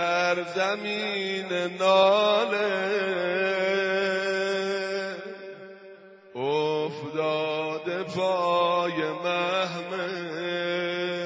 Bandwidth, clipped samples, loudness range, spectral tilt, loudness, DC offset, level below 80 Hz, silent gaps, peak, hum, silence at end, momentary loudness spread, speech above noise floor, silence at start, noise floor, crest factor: 8 kHz; under 0.1%; 6 LU; -4.5 dB/octave; -26 LUFS; under 0.1%; -74 dBFS; none; -8 dBFS; none; 0 s; 9 LU; 23 dB; 0 s; -48 dBFS; 18 dB